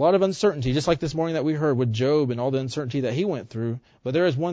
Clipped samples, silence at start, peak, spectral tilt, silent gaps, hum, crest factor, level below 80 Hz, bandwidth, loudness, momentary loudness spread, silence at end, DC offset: under 0.1%; 0 s; -8 dBFS; -6.5 dB/octave; none; none; 14 dB; -50 dBFS; 8 kHz; -24 LUFS; 7 LU; 0 s; under 0.1%